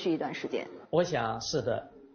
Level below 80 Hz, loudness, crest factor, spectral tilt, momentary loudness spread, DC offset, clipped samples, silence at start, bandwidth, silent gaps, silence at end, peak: -62 dBFS; -32 LUFS; 18 dB; -4.5 dB/octave; 8 LU; under 0.1%; under 0.1%; 0 s; 6.8 kHz; none; 0.1 s; -14 dBFS